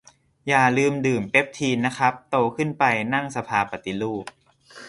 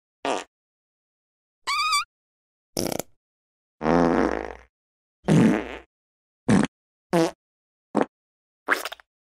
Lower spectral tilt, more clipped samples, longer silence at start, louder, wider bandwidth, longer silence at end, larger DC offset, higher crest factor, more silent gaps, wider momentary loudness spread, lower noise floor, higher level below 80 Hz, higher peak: about the same, -5 dB/octave vs -5 dB/octave; neither; first, 0.45 s vs 0.25 s; first, -22 LUFS vs -25 LUFS; second, 11.5 kHz vs 16 kHz; second, 0 s vs 0.4 s; neither; about the same, 22 dB vs 22 dB; second, none vs 0.47-1.62 s, 2.05-2.73 s, 3.16-3.78 s, 4.69-5.23 s, 5.86-6.46 s, 6.68-7.10 s, 7.35-7.94 s, 8.08-8.66 s; second, 9 LU vs 16 LU; second, -47 dBFS vs under -90 dBFS; second, -60 dBFS vs -50 dBFS; about the same, -2 dBFS vs -4 dBFS